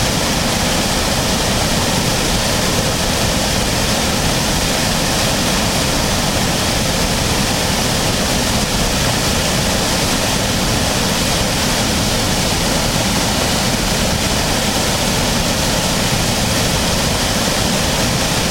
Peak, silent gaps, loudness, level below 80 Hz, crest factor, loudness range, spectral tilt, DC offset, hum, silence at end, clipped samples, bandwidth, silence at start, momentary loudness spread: -2 dBFS; none; -15 LUFS; -26 dBFS; 14 dB; 0 LU; -3 dB/octave; under 0.1%; none; 0 s; under 0.1%; 16.5 kHz; 0 s; 1 LU